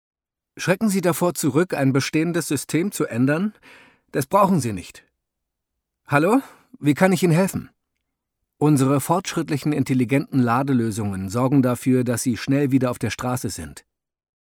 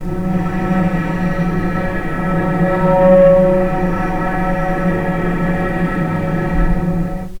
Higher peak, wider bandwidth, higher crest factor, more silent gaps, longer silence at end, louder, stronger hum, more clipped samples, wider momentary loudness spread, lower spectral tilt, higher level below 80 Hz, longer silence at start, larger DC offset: about the same, -2 dBFS vs 0 dBFS; first, 19 kHz vs 10.5 kHz; about the same, 18 dB vs 14 dB; neither; first, 0.75 s vs 0 s; second, -21 LUFS vs -16 LUFS; neither; neither; about the same, 9 LU vs 9 LU; second, -6 dB/octave vs -9 dB/octave; second, -56 dBFS vs -24 dBFS; first, 0.55 s vs 0 s; neither